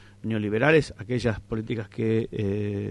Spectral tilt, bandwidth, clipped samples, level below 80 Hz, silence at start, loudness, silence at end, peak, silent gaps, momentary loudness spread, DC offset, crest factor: -7 dB/octave; 11 kHz; under 0.1%; -50 dBFS; 0 s; -26 LUFS; 0 s; -8 dBFS; none; 10 LU; under 0.1%; 18 dB